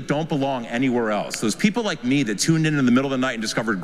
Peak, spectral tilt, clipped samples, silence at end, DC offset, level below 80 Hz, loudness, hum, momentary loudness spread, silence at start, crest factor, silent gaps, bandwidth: -6 dBFS; -5 dB/octave; under 0.1%; 0 s; under 0.1%; -52 dBFS; -21 LUFS; none; 5 LU; 0 s; 16 dB; none; 14.5 kHz